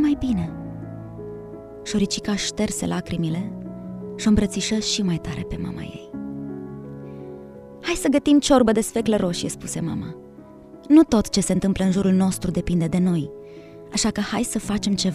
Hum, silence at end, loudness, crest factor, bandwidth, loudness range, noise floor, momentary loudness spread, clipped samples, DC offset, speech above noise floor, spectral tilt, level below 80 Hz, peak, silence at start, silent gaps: none; 0 s; -22 LUFS; 20 dB; 14 kHz; 6 LU; -43 dBFS; 19 LU; under 0.1%; under 0.1%; 22 dB; -5 dB/octave; -42 dBFS; -2 dBFS; 0 s; none